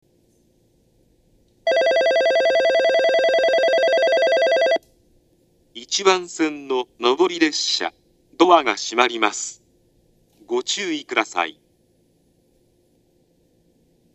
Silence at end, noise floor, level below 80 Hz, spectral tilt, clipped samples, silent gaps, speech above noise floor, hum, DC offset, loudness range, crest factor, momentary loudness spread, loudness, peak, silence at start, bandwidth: 2.65 s; -61 dBFS; -66 dBFS; -1.5 dB/octave; under 0.1%; none; 41 dB; none; under 0.1%; 10 LU; 22 dB; 9 LU; -19 LUFS; 0 dBFS; 1.65 s; 10.5 kHz